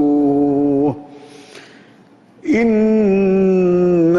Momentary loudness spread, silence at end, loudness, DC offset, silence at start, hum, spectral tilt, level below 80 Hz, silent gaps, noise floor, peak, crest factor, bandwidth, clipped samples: 6 LU; 0 s; -15 LUFS; under 0.1%; 0 s; none; -9 dB/octave; -50 dBFS; none; -47 dBFS; -6 dBFS; 10 dB; 7.4 kHz; under 0.1%